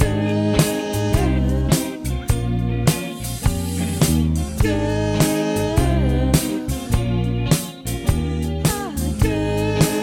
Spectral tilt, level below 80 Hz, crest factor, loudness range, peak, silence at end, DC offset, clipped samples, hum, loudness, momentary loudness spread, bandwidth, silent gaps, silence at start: -5.5 dB/octave; -26 dBFS; 18 dB; 2 LU; 0 dBFS; 0 s; under 0.1%; under 0.1%; none; -20 LUFS; 5 LU; 17 kHz; none; 0 s